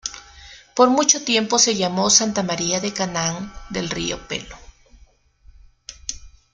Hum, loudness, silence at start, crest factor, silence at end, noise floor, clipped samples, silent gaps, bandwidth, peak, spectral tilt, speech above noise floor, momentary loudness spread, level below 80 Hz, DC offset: none; -19 LUFS; 0.05 s; 22 dB; 0.25 s; -53 dBFS; under 0.1%; none; 11 kHz; 0 dBFS; -2.5 dB/octave; 33 dB; 17 LU; -48 dBFS; under 0.1%